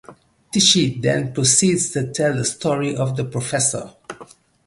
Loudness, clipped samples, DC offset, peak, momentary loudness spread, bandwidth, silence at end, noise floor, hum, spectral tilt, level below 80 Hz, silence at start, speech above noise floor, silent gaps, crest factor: -18 LUFS; under 0.1%; under 0.1%; -2 dBFS; 16 LU; 11.5 kHz; 0.4 s; -45 dBFS; none; -3.5 dB/octave; -54 dBFS; 0.1 s; 26 dB; none; 18 dB